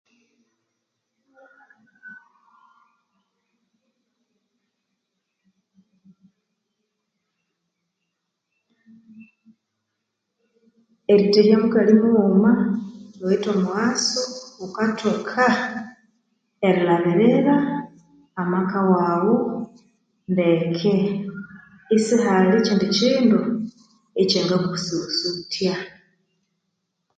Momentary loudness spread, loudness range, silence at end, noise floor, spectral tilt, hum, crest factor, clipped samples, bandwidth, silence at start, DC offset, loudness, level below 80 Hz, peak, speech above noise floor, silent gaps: 16 LU; 5 LU; 1.3 s; -79 dBFS; -5.5 dB/octave; none; 20 dB; under 0.1%; 9.2 kHz; 2.05 s; under 0.1%; -20 LUFS; -66 dBFS; -4 dBFS; 60 dB; none